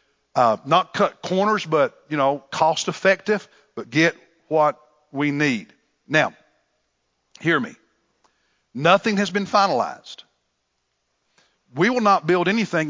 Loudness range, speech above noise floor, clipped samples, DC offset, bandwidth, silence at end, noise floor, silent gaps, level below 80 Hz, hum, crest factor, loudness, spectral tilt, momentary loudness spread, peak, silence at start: 4 LU; 53 dB; under 0.1%; under 0.1%; 7.6 kHz; 0 s; -73 dBFS; none; -70 dBFS; none; 20 dB; -21 LUFS; -5 dB/octave; 11 LU; -2 dBFS; 0.35 s